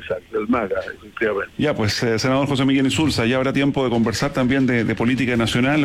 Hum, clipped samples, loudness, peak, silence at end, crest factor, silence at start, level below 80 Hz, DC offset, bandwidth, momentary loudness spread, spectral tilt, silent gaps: none; under 0.1%; -20 LUFS; -8 dBFS; 0 s; 10 dB; 0 s; -46 dBFS; under 0.1%; 15 kHz; 6 LU; -5.5 dB/octave; none